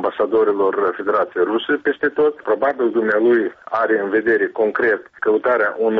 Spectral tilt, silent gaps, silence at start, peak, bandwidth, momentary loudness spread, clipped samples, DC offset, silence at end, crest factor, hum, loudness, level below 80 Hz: -3 dB/octave; none; 0 s; -6 dBFS; 4.7 kHz; 3 LU; under 0.1%; under 0.1%; 0 s; 12 dB; none; -18 LUFS; -62 dBFS